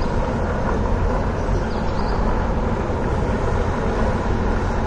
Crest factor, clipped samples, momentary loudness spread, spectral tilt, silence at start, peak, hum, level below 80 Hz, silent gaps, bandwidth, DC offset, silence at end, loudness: 12 dB; under 0.1%; 1 LU; -7.5 dB/octave; 0 s; -8 dBFS; none; -24 dBFS; none; 9.2 kHz; under 0.1%; 0 s; -22 LUFS